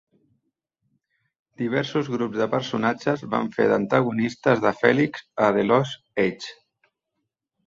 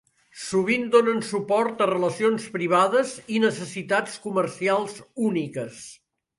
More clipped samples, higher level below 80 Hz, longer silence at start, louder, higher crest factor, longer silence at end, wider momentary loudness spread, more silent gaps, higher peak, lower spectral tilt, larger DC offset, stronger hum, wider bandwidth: neither; first, -64 dBFS vs -70 dBFS; first, 1.6 s vs 0.35 s; about the same, -23 LUFS vs -24 LUFS; about the same, 22 dB vs 18 dB; first, 1.15 s vs 0.45 s; second, 7 LU vs 13 LU; neither; first, -2 dBFS vs -6 dBFS; first, -6.5 dB/octave vs -5 dB/octave; neither; neither; second, 7.8 kHz vs 11.5 kHz